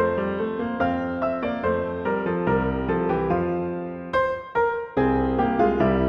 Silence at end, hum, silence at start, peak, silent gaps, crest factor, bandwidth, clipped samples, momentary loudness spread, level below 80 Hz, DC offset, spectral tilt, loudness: 0 s; none; 0 s; -8 dBFS; none; 16 dB; 6.4 kHz; under 0.1%; 5 LU; -40 dBFS; under 0.1%; -9 dB/octave; -24 LUFS